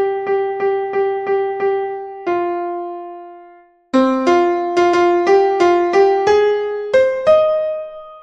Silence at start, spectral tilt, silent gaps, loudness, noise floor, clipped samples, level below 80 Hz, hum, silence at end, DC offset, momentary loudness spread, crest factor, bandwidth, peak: 0 s; -5 dB/octave; none; -16 LUFS; -45 dBFS; under 0.1%; -54 dBFS; none; 0 s; under 0.1%; 12 LU; 14 dB; 8.2 kHz; -2 dBFS